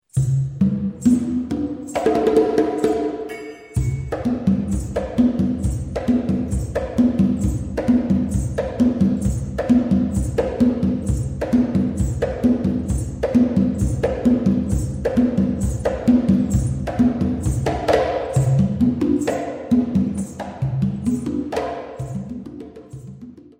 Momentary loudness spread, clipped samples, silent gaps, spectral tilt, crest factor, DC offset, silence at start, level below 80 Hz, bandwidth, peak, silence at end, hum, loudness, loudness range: 9 LU; under 0.1%; none; -8 dB/octave; 16 dB; under 0.1%; 0.15 s; -32 dBFS; 15.5 kHz; -4 dBFS; 0.2 s; none; -20 LUFS; 3 LU